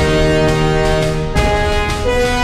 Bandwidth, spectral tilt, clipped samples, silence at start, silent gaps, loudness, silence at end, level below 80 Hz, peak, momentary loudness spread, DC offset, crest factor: 15 kHz; -5.5 dB/octave; under 0.1%; 0 s; none; -15 LUFS; 0 s; -20 dBFS; -2 dBFS; 3 LU; under 0.1%; 12 dB